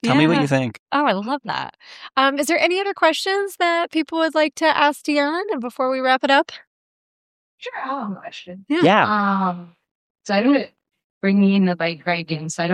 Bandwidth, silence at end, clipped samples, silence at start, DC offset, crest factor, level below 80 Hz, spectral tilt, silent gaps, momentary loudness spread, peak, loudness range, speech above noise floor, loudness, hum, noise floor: 15.5 kHz; 0 s; under 0.1%; 0.05 s; under 0.1%; 18 dB; -68 dBFS; -5 dB/octave; 0.79-0.86 s, 6.67-7.58 s, 9.91-10.15 s, 11.04-11.21 s; 14 LU; -2 dBFS; 3 LU; over 71 dB; -19 LUFS; none; under -90 dBFS